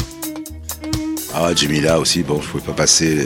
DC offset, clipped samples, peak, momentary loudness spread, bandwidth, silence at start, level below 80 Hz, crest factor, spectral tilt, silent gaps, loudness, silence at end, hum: under 0.1%; under 0.1%; 0 dBFS; 15 LU; 17 kHz; 0 s; -38 dBFS; 18 dB; -3 dB/octave; none; -17 LUFS; 0 s; none